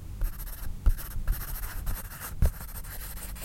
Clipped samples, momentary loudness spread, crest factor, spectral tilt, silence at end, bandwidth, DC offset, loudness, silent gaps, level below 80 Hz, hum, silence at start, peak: under 0.1%; 9 LU; 20 dB; -4.5 dB/octave; 0 s; 17 kHz; under 0.1%; -35 LUFS; none; -32 dBFS; none; 0 s; -10 dBFS